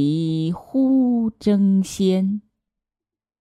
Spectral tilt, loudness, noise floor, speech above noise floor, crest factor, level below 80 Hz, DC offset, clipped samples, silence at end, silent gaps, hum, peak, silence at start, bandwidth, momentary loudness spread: -7.5 dB/octave; -20 LUFS; -90 dBFS; 70 dB; 12 dB; -58 dBFS; under 0.1%; under 0.1%; 1 s; none; none; -8 dBFS; 0 s; 12.5 kHz; 7 LU